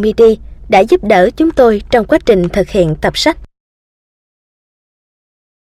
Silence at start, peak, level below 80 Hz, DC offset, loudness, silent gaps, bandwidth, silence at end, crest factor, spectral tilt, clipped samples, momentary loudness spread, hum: 0 s; 0 dBFS; -32 dBFS; under 0.1%; -11 LUFS; none; 14.5 kHz; 2.3 s; 12 dB; -5.5 dB/octave; under 0.1%; 5 LU; none